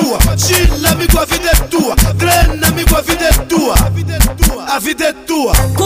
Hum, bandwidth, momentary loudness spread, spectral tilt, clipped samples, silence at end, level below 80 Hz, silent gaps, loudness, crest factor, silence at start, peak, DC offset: none; 16.5 kHz; 5 LU; -4 dB/octave; under 0.1%; 0 s; -16 dBFS; none; -12 LUFS; 12 dB; 0 s; 0 dBFS; 0.3%